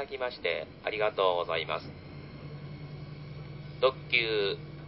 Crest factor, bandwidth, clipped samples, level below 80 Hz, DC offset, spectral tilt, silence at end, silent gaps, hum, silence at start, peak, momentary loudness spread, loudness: 22 dB; 5.8 kHz; under 0.1%; -58 dBFS; under 0.1%; -8.5 dB/octave; 0 s; none; none; 0 s; -10 dBFS; 17 LU; -30 LUFS